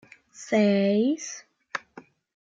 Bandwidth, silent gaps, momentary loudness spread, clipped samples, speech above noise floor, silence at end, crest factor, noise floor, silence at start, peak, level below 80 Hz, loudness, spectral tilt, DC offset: 7.8 kHz; none; 18 LU; under 0.1%; 28 dB; 0.4 s; 16 dB; -51 dBFS; 0.4 s; -12 dBFS; -74 dBFS; -25 LUFS; -5.5 dB/octave; under 0.1%